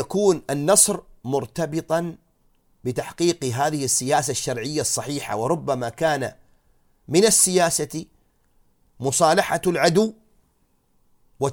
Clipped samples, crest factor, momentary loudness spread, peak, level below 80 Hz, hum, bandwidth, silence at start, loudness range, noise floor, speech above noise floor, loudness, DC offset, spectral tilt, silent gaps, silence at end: under 0.1%; 22 dB; 13 LU; 0 dBFS; -56 dBFS; none; 18 kHz; 0 s; 4 LU; -64 dBFS; 43 dB; -21 LUFS; under 0.1%; -3.5 dB/octave; none; 0 s